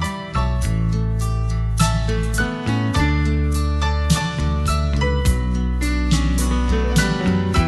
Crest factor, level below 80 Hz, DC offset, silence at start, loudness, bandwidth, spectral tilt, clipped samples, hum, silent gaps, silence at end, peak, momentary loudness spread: 16 dB; -22 dBFS; under 0.1%; 0 s; -20 LUFS; 13 kHz; -5.5 dB/octave; under 0.1%; none; none; 0 s; -4 dBFS; 4 LU